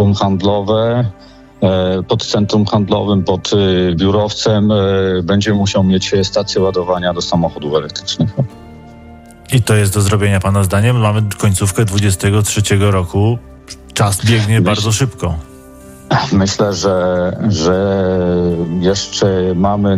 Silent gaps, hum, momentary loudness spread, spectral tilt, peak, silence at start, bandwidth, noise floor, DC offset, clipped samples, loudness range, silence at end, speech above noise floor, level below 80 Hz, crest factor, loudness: none; none; 5 LU; -5.5 dB/octave; -2 dBFS; 0 s; 15.5 kHz; -36 dBFS; under 0.1%; under 0.1%; 3 LU; 0 s; 23 dB; -40 dBFS; 12 dB; -14 LUFS